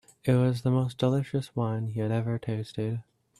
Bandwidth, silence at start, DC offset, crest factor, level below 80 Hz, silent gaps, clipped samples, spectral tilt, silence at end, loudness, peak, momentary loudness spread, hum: 12.5 kHz; 0.25 s; under 0.1%; 18 dB; -62 dBFS; none; under 0.1%; -8 dB/octave; 0.4 s; -29 LUFS; -12 dBFS; 8 LU; none